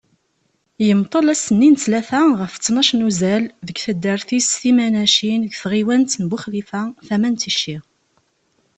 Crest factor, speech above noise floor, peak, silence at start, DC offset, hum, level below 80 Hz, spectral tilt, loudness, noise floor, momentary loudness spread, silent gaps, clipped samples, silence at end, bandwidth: 16 dB; 49 dB; -2 dBFS; 0.8 s; under 0.1%; none; -58 dBFS; -4 dB/octave; -17 LUFS; -66 dBFS; 11 LU; none; under 0.1%; 0.95 s; 8.8 kHz